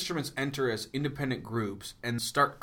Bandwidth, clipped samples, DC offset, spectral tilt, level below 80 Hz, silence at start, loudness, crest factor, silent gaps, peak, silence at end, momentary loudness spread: 19 kHz; under 0.1%; under 0.1%; -4.5 dB/octave; -60 dBFS; 0 s; -32 LUFS; 20 dB; none; -12 dBFS; 0 s; 7 LU